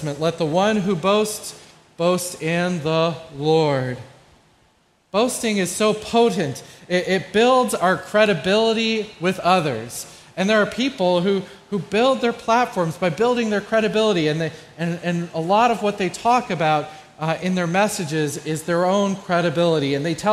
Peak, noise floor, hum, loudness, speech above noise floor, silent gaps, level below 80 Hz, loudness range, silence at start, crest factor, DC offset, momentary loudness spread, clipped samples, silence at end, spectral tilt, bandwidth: -2 dBFS; -60 dBFS; none; -20 LUFS; 40 dB; none; -58 dBFS; 4 LU; 0 s; 18 dB; under 0.1%; 8 LU; under 0.1%; 0 s; -5 dB/octave; 15.5 kHz